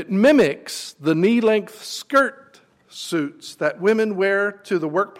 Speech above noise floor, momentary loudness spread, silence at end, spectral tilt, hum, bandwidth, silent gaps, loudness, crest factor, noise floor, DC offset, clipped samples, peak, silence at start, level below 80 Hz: 33 dB; 14 LU; 0.1 s; -5 dB/octave; none; 16 kHz; none; -20 LUFS; 14 dB; -52 dBFS; under 0.1%; under 0.1%; -6 dBFS; 0 s; -64 dBFS